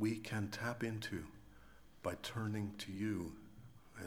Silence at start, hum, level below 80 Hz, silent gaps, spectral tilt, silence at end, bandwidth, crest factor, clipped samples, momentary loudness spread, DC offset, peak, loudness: 0 s; none; -66 dBFS; none; -5.5 dB/octave; 0 s; over 20 kHz; 18 dB; under 0.1%; 18 LU; under 0.1%; -26 dBFS; -43 LUFS